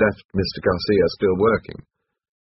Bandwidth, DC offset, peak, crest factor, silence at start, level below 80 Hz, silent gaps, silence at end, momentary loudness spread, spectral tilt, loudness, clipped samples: 6 kHz; under 0.1%; -4 dBFS; 18 dB; 0 s; -46 dBFS; 0.25-0.29 s; 0.8 s; 7 LU; -4.5 dB/octave; -20 LUFS; under 0.1%